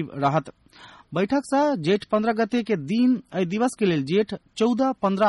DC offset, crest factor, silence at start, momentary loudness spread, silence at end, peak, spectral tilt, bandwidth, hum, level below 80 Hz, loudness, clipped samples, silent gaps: under 0.1%; 14 dB; 0 s; 5 LU; 0 s; -10 dBFS; -6.5 dB/octave; 11.5 kHz; none; -62 dBFS; -23 LUFS; under 0.1%; none